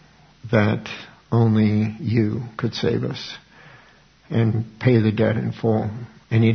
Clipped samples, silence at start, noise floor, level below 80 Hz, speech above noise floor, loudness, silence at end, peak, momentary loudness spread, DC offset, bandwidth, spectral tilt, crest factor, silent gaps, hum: under 0.1%; 0.45 s; -52 dBFS; -56 dBFS; 32 dB; -21 LUFS; 0 s; -4 dBFS; 14 LU; under 0.1%; 6.4 kHz; -8 dB/octave; 18 dB; none; none